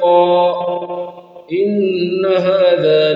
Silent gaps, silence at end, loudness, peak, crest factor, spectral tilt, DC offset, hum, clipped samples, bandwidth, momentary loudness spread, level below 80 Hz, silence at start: none; 0 s; -15 LUFS; -2 dBFS; 12 dB; -8 dB/octave; under 0.1%; none; under 0.1%; 5.2 kHz; 13 LU; -64 dBFS; 0 s